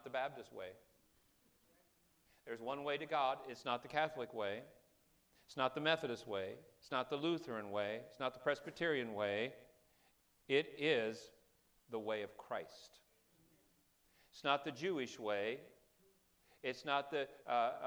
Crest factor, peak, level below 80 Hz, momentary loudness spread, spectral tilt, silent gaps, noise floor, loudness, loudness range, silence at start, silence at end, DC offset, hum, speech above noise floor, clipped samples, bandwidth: 24 dB; -20 dBFS; -82 dBFS; 14 LU; -4.5 dB/octave; none; -75 dBFS; -41 LUFS; 4 LU; 0.05 s; 0 s; under 0.1%; none; 34 dB; under 0.1%; over 20 kHz